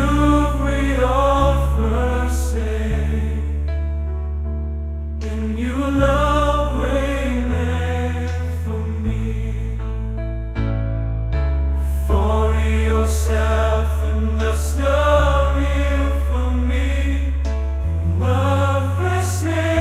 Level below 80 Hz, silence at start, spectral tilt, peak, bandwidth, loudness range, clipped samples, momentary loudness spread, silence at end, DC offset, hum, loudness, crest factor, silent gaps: -22 dBFS; 0 s; -6.5 dB/octave; -2 dBFS; 14 kHz; 5 LU; under 0.1%; 9 LU; 0 s; under 0.1%; none; -20 LUFS; 16 dB; none